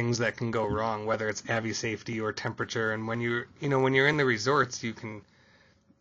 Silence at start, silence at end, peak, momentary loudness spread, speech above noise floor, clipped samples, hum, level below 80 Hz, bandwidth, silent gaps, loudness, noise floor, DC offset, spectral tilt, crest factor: 0 s; 0.8 s; -10 dBFS; 10 LU; 33 dB; under 0.1%; none; -60 dBFS; 8 kHz; none; -29 LUFS; -62 dBFS; under 0.1%; -5 dB/octave; 20 dB